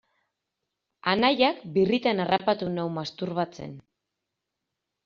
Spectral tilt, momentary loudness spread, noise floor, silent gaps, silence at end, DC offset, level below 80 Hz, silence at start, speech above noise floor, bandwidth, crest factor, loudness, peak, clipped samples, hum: -3.5 dB/octave; 10 LU; -84 dBFS; none; 1.25 s; under 0.1%; -66 dBFS; 1.05 s; 59 dB; 7.2 kHz; 22 dB; -26 LUFS; -6 dBFS; under 0.1%; none